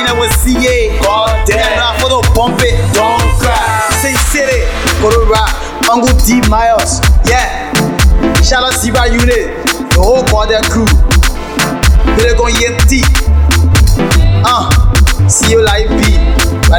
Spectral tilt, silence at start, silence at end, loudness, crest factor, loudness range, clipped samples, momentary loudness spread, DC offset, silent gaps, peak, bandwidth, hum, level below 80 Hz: -4.5 dB/octave; 0 s; 0 s; -10 LUFS; 8 dB; 1 LU; under 0.1%; 3 LU; 0.5%; none; 0 dBFS; 19 kHz; none; -12 dBFS